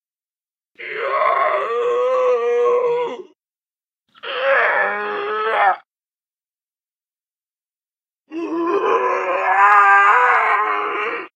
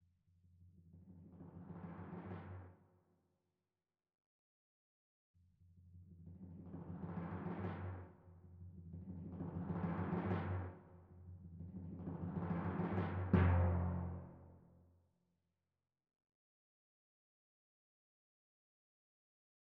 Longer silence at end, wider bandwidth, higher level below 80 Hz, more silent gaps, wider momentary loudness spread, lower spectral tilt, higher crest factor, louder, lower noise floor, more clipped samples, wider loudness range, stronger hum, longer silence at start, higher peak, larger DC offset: second, 0.1 s vs 5.05 s; first, 8.6 kHz vs 4 kHz; second, -84 dBFS vs -60 dBFS; second, 3.56-3.60 s, 6.08-6.12 s vs 4.26-5.34 s; second, 16 LU vs 24 LU; second, -3 dB/octave vs -9 dB/octave; second, 18 dB vs 24 dB; first, -16 LUFS vs -43 LUFS; about the same, under -90 dBFS vs under -90 dBFS; neither; second, 10 LU vs 17 LU; neither; first, 0.8 s vs 0.6 s; first, -2 dBFS vs -20 dBFS; neither